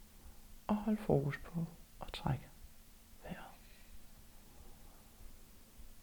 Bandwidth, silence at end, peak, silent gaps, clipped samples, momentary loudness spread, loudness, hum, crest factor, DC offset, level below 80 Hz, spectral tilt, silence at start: over 20 kHz; 0 s; -18 dBFS; none; under 0.1%; 25 LU; -40 LUFS; none; 24 dB; under 0.1%; -56 dBFS; -7 dB/octave; 0 s